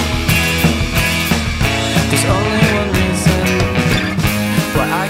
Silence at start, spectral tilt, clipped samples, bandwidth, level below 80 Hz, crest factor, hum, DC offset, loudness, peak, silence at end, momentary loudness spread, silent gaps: 0 s; -4.5 dB/octave; under 0.1%; 16.5 kHz; -26 dBFS; 14 dB; none; under 0.1%; -14 LUFS; 0 dBFS; 0 s; 3 LU; none